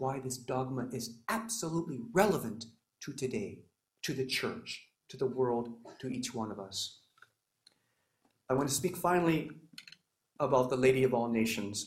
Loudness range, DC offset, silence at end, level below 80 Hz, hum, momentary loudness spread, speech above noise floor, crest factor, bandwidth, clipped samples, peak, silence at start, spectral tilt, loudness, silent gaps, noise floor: 7 LU; under 0.1%; 0 s; -66 dBFS; none; 16 LU; 45 dB; 24 dB; 16 kHz; under 0.1%; -12 dBFS; 0 s; -4.5 dB/octave; -33 LUFS; none; -78 dBFS